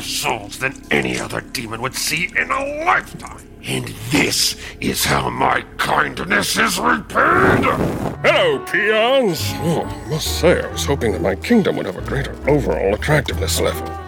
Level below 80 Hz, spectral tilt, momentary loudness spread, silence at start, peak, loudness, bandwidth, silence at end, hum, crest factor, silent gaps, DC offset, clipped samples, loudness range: -36 dBFS; -4 dB/octave; 10 LU; 0 s; -2 dBFS; -18 LUFS; over 20 kHz; 0 s; none; 16 dB; none; under 0.1%; under 0.1%; 4 LU